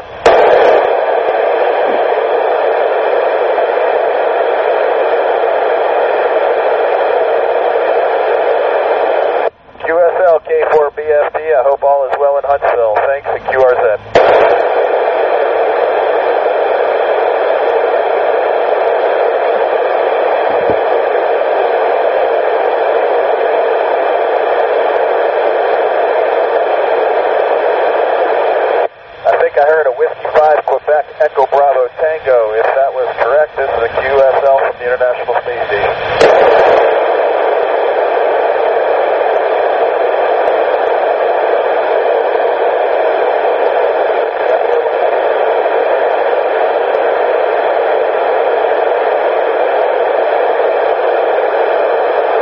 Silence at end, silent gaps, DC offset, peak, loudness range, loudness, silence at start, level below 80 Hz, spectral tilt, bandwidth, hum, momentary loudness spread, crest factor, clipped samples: 0 s; none; under 0.1%; 0 dBFS; 1 LU; -12 LUFS; 0 s; -50 dBFS; -1 dB/octave; 7.4 kHz; none; 3 LU; 12 dB; under 0.1%